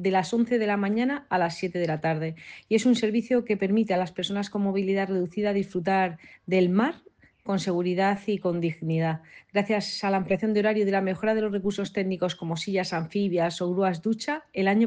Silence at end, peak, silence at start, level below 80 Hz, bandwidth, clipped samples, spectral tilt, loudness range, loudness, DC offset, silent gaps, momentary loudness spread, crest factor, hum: 0 s; -10 dBFS; 0 s; -66 dBFS; 9.6 kHz; under 0.1%; -6 dB/octave; 1 LU; -26 LUFS; under 0.1%; none; 6 LU; 16 dB; none